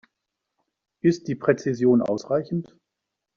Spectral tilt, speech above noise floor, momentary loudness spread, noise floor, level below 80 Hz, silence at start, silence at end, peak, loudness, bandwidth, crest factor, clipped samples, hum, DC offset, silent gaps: -7.5 dB/octave; 61 dB; 7 LU; -83 dBFS; -66 dBFS; 1.05 s; 0.75 s; -6 dBFS; -23 LUFS; 7.4 kHz; 20 dB; under 0.1%; none; under 0.1%; none